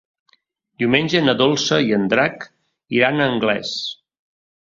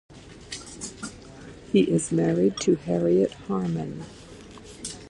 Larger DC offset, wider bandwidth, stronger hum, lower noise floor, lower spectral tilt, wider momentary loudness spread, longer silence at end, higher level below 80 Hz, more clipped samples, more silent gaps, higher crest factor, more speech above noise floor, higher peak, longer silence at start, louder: neither; second, 7.6 kHz vs 11.5 kHz; neither; first, -62 dBFS vs -44 dBFS; second, -4.5 dB/octave vs -6 dB/octave; second, 12 LU vs 22 LU; first, 0.75 s vs 0 s; about the same, -58 dBFS vs -54 dBFS; neither; neither; about the same, 18 dB vs 18 dB; first, 44 dB vs 21 dB; first, -2 dBFS vs -8 dBFS; first, 0.8 s vs 0.1 s; first, -18 LUFS vs -25 LUFS